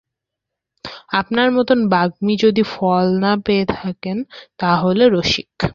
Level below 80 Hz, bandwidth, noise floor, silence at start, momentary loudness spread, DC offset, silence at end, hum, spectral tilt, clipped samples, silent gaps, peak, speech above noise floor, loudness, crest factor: -46 dBFS; 7.4 kHz; -82 dBFS; 0.85 s; 11 LU; under 0.1%; 0 s; none; -6 dB/octave; under 0.1%; none; -2 dBFS; 65 dB; -17 LUFS; 16 dB